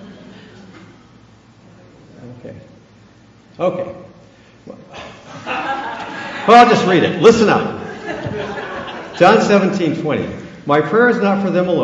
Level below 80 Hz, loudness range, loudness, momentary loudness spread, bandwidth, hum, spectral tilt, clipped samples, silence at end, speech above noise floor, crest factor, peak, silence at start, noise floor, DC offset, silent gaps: -52 dBFS; 15 LU; -14 LUFS; 24 LU; 8.4 kHz; none; -5.5 dB/octave; under 0.1%; 0 s; 33 dB; 16 dB; 0 dBFS; 0 s; -46 dBFS; under 0.1%; none